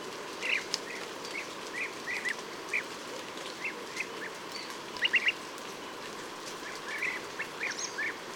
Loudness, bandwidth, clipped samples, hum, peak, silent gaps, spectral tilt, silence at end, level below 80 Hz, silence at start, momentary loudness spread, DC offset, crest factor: -34 LUFS; over 20 kHz; under 0.1%; none; -12 dBFS; none; -1 dB/octave; 0 s; -74 dBFS; 0 s; 10 LU; under 0.1%; 26 dB